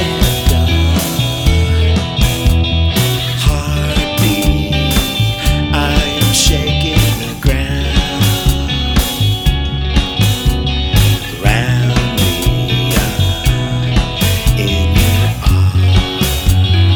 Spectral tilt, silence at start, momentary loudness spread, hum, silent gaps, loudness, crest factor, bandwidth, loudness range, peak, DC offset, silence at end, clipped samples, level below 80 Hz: -4.5 dB/octave; 0 s; 3 LU; none; none; -13 LUFS; 12 dB; over 20 kHz; 1 LU; 0 dBFS; under 0.1%; 0 s; under 0.1%; -18 dBFS